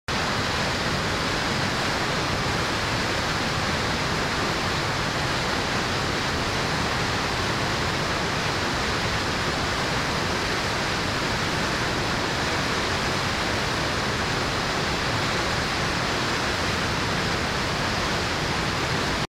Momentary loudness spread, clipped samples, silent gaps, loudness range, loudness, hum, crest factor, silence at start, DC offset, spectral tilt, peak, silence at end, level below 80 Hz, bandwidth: 1 LU; under 0.1%; none; 0 LU; -24 LUFS; none; 14 dB; 0.1 s; under 0.1%; -3.5 dB/octave; -12 dBFS; 0.05 s; -40 dBFS; 16 kHz